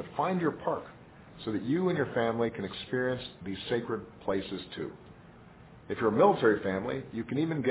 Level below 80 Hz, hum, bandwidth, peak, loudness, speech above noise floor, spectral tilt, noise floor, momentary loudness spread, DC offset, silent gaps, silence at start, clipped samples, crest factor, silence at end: -60 dBFS; none; 4 kHz; -12 dBFS; -31 LUFS; 22 dB; -5 dB/octave; -53 dBFS; 14 LU; under 0.1%; none; 0 s; under 0.1%; 20 dB; 0 s